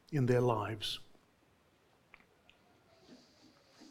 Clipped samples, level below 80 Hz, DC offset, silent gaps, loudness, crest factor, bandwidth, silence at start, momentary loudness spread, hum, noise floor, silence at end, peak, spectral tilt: under 0.1%; -66 dBFS; under 0.1%; none; -34 LUFS; 22 dB; 15.5 kHz; 0.1 s; 10 LU; none; -70 dBFS; 0.05 s; -18 dBFS; -6.5 dB/octave